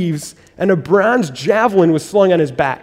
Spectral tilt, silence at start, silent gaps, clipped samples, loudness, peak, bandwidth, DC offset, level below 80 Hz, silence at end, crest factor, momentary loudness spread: -6 dB/octave; 0 s; none; under 0.1%; -14 LUFS; 0 dBFS; 16 kHz; under 0.1%; -52 dBFS; 0.05 s; 14 dB; 8 LU